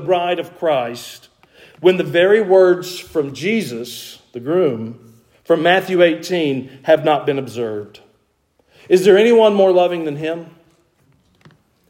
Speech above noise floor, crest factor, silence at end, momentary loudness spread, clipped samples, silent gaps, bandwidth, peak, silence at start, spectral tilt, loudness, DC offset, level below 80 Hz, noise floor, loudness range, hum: 46 dB; 16 dB; 1.4 s; 17 LU; under 0.1%; none; 16.5 kHz; 0 dBFS; 0 s; -5.5 dB/octave; -16 LUFS; under 0.1%; -64 dBFS; -62 dBFS; 3 LU; none